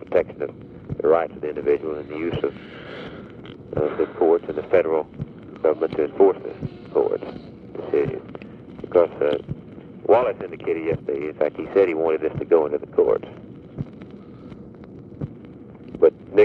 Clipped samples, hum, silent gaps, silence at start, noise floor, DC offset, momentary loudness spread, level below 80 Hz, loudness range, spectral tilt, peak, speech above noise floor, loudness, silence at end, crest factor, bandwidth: under 0.1%; none; none; 0 s; -41 dBFS; under 0.1%; 21 LU; -52 dBFS; 4 LU; -9.5 dB/octave; -2 dBFS; 19 dB; -22 LUFS; 0 s; 20 dB; 4.8 kHz